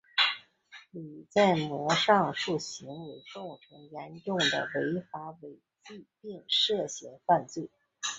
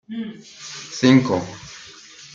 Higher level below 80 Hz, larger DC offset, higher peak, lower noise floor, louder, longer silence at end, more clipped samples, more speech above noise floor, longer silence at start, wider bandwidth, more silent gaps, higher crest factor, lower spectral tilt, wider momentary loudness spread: second, -72 dBFS vs -62 dBFS; neither; second, -8 dBFS vs -2 dBFS; first, -55 dBFS vs -43 dBFS; second, -28 LUFS vs -19 LUFS; about the same, 0 s vs 0.1 s; neither; about the same, 24 dB vs 23 dB; about the same, 0.15 s vs 0.1 s; about the same, 8.2 kHz vs 7.6 kHz; neither; about the same, 22 dB vs 20 dB; second, -3.5 dB/octave vs -5.5 dB/octave; about the same, 21 LU vs 23 LU